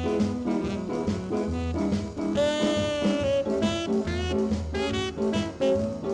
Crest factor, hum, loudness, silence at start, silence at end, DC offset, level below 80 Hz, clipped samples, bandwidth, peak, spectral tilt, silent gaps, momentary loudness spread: 14 dB; none; -27 LUFS; 0 s; 0 s; under 0.1%; -42 dBFS; under 0.1%; 11 kHz; -14 dBFS; -6 dB/octave; none; 4 LU